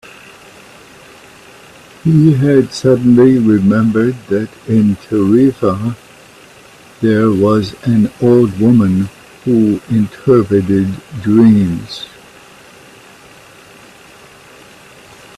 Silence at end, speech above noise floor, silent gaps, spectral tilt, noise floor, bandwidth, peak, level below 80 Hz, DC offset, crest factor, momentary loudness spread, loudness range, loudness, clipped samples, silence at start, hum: 3.3 s; 29 dB; none; -8 dB/octave; -40 dBFS; 13 kHz; 0 dBFS; -48 dBFS; under 0.1%; 14 dB; 11 LU; 4 LU; -12 LUFS; under 0.1%; 2.05 s; none